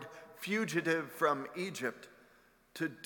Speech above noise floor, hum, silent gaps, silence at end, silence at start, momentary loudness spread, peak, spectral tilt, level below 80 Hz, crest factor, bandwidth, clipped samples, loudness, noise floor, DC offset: 30 dB; none; none; 0 s; 0 s; 17 LU; -16 dBFS; -4.5 dB/octave; -80 dBFS; 22 dB; 18 kHz; under 0.1%; -35 LUFS; -66 dBFS; under 0.1%